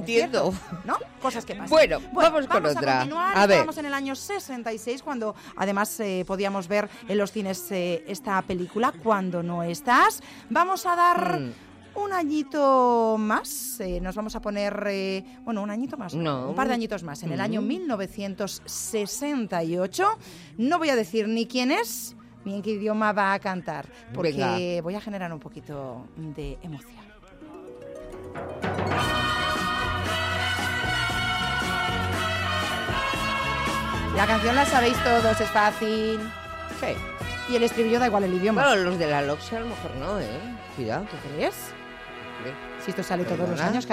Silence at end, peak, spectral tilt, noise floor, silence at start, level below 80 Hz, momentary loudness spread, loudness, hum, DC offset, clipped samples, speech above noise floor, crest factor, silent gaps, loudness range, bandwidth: 0 s; -10 dBFS; -4.5 dB/octave; -47 dBFS; 0 s; -48 dBFS; 15 LU; -25 LUFS; none; under 0.1%; under 0.1%; 21 dB; 16 dB; none; 8 LU; 16 kHz